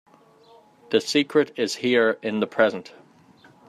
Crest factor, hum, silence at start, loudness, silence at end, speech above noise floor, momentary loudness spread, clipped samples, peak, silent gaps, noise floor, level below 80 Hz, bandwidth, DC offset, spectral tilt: 20 dB; none; 0.9 s; -22 LUFS; 0.85 s; 31 dB; 6 LU; under 0.1%; -4 dBFS; none; -54 dBFS; -72 dBFS; 13.5 kHz; under 0.1%; -4 dB/octave